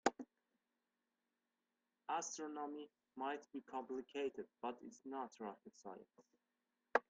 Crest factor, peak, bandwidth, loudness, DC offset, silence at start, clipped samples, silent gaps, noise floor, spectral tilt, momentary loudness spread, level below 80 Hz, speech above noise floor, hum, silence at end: 30 dB; -18 dBFS; 9 kHz; -48 LUFS; under 0.1%; 0.05 s; under 0.1%; none; under -90 dBFS; -2.5 dB/octave; 13 LU; -90 dBFS; over 41 dB; none; 0.1 s